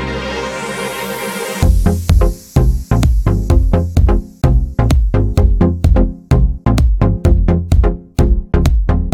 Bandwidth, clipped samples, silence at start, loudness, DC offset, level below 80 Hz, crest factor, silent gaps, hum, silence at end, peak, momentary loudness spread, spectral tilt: 15.5 kHz; under 0.1%; 0 s; -15 LUFS; under 0.1%; -14 dBFS; 12 dB; none; none; 0 s; 0 dBFS; 7 LU; -7 dB/octave